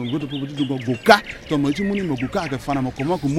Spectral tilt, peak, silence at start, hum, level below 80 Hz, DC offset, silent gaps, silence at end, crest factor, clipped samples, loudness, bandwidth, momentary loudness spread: -6 dB/octave; 0 dBFS; 0 s; none; -46 dBFS; under 0.1%; none; 0 s; 20 dB; under 0.1%; -21 LUFS; 15.5 kHz; 10 LU